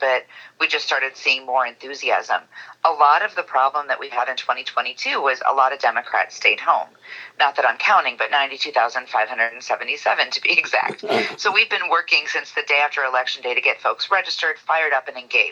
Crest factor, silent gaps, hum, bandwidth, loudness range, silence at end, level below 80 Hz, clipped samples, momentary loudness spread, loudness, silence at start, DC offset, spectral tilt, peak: 20 dB; none; none; 9.2 kHz; 2 LU; 0 s; -90 dBFS; under 0.1%; 7 LU; -19 LUFS; 0 s; under 0.1%; -1 dB/octave; 0 dBFS